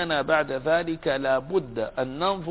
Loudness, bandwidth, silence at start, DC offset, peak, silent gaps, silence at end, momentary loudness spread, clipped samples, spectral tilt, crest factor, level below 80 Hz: -25 LUFS; 4 kHz; 0 s; under 0.1%; -8 dBFS; none; 0 s; 6 LU; under 0.1%; -9 dB/octave; 16 dB; -52 dBFS